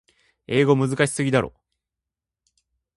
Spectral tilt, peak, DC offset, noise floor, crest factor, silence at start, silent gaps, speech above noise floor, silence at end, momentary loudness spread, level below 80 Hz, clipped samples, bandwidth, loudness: -5.5 dB/octave; -4 dBFS; under 0.1%; -87 dBFS; 20 dB; 0.5 s; none; 67 dB; 1.5 s; 6 LU; -56 dBFS; under 0.1%; 11.5 kHz; -21 LUFS